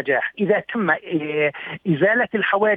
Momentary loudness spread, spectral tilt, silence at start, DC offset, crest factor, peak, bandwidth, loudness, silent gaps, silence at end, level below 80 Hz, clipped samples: 6 LU; -8.5 dB/octave; 0 s; under 0.1%; 16 dB; -4 dBFS; 3.9 kHz; -20 LUFS; none; 0 s; -66 dBFS; under 0.1%